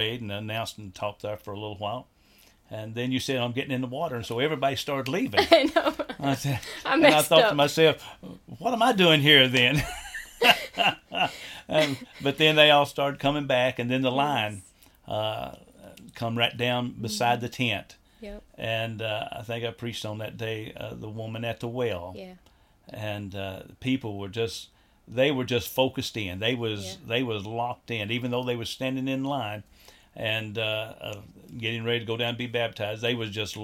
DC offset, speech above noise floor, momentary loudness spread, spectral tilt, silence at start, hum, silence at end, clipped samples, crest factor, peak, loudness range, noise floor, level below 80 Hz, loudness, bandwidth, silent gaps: under 0.1%; 32 dB; 17 LU; -4.5 dB/octave; 0 s; none; 0 s; under 0.1%; 24 dB; -4 dBFS; 12 LU; -58 dBFS; -56 dBFS; -25 LUFS; 17 kHz; none